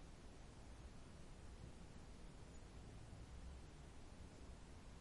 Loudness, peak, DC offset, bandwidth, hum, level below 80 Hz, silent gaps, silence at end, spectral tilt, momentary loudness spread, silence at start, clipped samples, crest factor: -61 LUFS; -44 dBFS; under 0.1%; 11.5 kHz; none; -60 dBFS; none; 0 s; -5.5 dB/octave; 3 LU; 0 s; under 0.1%; 12 dB